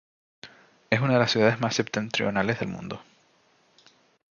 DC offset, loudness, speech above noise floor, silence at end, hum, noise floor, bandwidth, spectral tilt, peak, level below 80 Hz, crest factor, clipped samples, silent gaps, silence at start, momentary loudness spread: under 0.1%; -25 LUFS; 39 dB; 1.3 s; none; -64 dBFS; 7.2 kHz; -5 dB/octave; -4 dBFS; -62 dBFS; 22 dB; under 0.1%; none; 0.45 s; 14 LU